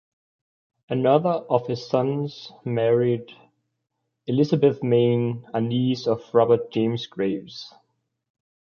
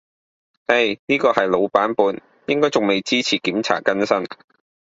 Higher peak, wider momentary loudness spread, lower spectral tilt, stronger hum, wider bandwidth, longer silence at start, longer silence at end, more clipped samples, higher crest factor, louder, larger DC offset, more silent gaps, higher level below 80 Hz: second, -4 dBFS vs 0 dBFS; first, 12 LU vs 5 LU; first, -8 dB/octave vs -4 dB/octave; neither; second, 6.8 kHz vs 7.8 kHz; first, 0.9 s vs 0.7 s; first, 1.1 s vs 0.5 s; neither; about the same, 20 dB vs 20 dB; second, -23 LUFS vs -19 LUFS; neither; second, none vs 0.99-1.07 s; about the same, -64 dBFS vs -62 dBFS